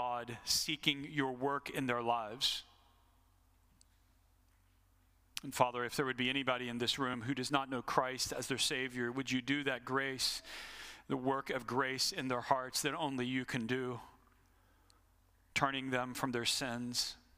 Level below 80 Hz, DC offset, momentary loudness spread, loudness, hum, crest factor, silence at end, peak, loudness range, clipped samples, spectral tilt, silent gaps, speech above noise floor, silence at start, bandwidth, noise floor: -68 dBFS; under 0.1%; 6 LU; -36 LUFS; none; 24 dB; 0.2 s; -14 dBFS; 5 LU; under 0.1%; -3 dB/octave; none; 33 dB; 0 s; 15.5 kHz; -70 dBFS